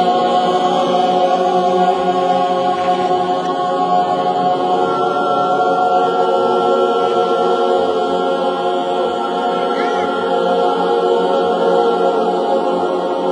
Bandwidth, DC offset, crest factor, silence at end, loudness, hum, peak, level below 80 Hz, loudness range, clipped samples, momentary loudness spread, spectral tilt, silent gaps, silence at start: 10.5 kHz; under 0.1%; 12 dB; 0 s; -15 LUFS; none; -2 dBFS; -62 dBFS; 2 LU; under 0.1%; 3 LU; -5.5 dB/octave; none; 0 s